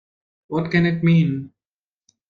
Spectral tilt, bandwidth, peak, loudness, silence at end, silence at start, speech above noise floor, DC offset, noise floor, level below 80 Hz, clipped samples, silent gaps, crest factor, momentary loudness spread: -9 dB/octave; 5 kHz; -4 dBFS; -19 LUFS; 0.8 s; 0.5 s; over 72 dB; under 0.1%; under -90 dBFS; -56 dBFS; under 0.1%; none; 16 dB; 11 LU